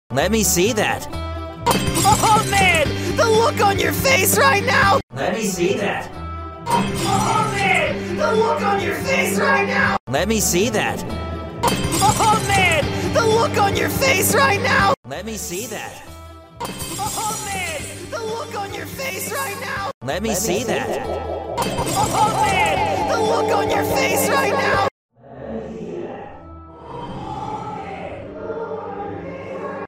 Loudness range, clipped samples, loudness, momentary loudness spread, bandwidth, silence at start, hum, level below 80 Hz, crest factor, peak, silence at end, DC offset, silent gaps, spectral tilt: 10 LU; under 0.1%; -19 LUFS; 15 LU; 16 kHz; 0.1 s; none; -40 dBFS; 18 dB; -2 dBFS; 0 s; under 0.1%; 5.03-5.08 s, 10.00-10.07 s, 14.97-15.03 s, 19.94-20.01 s, 24.91-25.09 s; -3.5 dB/octave